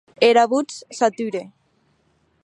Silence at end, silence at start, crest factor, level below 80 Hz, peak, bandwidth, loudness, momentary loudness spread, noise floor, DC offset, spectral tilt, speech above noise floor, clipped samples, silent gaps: 0.95 s; 0.2 s; 20 dB; -76 dBFS; -2 dBFS; 11 kHz; -20 LUFS; 15 LU; -64 dBFS; under 0.1%; -3.5 dB/octave; 45 dB; under 0.1%; none